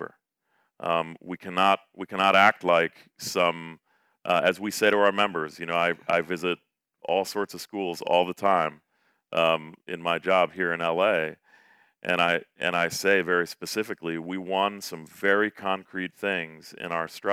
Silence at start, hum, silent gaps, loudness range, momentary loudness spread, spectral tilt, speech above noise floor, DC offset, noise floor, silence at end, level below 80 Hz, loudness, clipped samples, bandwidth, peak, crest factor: 0 s; none; none; 4 LU; 13 LU; -4 dB/octave; 47 dB; under 0.1%; -73 dBFS; 0 s; -76 dBFS; -25 LUFS; under 0.1%; 16.5 kHz; -2 dBFS; 24 dB